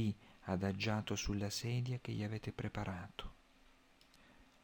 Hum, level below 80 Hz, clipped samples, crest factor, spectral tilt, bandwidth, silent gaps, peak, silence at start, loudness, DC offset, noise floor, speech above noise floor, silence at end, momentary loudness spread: none; -58 dBFS; under 0.1%; 16 dB; -5.5 dB/octave; 17.5 kHz; none; -24 dBFS; 0 s; -41 LUFS; under 0.1%; -67 dBFS; 27 dB; 0.2 s; 11 LU